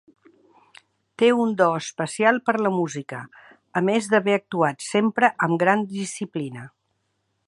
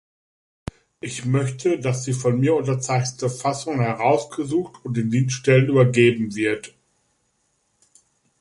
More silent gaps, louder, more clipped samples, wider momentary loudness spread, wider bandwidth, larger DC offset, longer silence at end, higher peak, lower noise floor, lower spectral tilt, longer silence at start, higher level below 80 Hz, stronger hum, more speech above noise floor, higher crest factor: neither; about the same, -22 LUFS vs -21 LUFS; neither; second, 12 LU vs 15 LU; about the same, 11.5 kHz vs 11.5 kHz; neither; second, 0.8 s vs 1.7 s; about the same, -2 dBFS vs -2 dBFS; first, -73 dBFS vs -69 dBFS; about the same, -5 dB/octave vs -6 dB/octave; first, 1.2 s vs 1.05 s; second, -74 dBFS vs -56 dBFS; neither; about the same, 51 dB vs 48 dB; about the same, 20 dB vs 20 dB